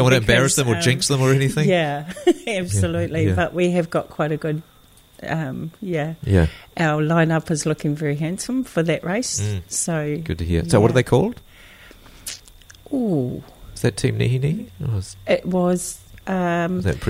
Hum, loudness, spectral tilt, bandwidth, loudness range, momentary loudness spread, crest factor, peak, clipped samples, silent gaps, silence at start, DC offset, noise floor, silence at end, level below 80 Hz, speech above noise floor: none; -21 LUFS; -5 dB/octave; 16 kHz; 5 LU; 11 LU; 20 dB; -2 dBFS; under 0.1%; none; 0 s; under 0.1%; -49 dBFS; 0 s; -40 dBFS; 29 dB